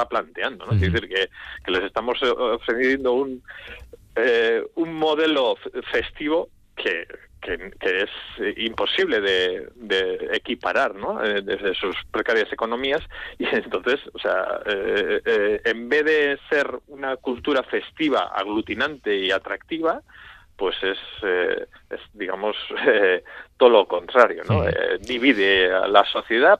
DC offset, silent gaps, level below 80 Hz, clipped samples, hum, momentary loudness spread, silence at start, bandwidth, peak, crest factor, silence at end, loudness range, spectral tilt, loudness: under 0.1%; none; -50 dBFS; under 0.1%; none; 12 LU; 0 s; 8.8 kHz; 0 dBFS; 22 dB; 0 s; 6 LU; -6 dB/octave; -22 LUFS